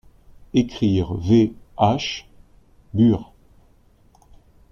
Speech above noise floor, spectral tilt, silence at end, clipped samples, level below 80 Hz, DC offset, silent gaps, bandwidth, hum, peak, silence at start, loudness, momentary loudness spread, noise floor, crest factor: 36 dB; -7 dB/octave; 1.5 s; under 0.1%; -46 dBFS; under 0.1%; none; 7 kHz; none; -4 dBFS; 0.55 s; -21 LUFS; 10 LU; -55 dBFS; 18 dB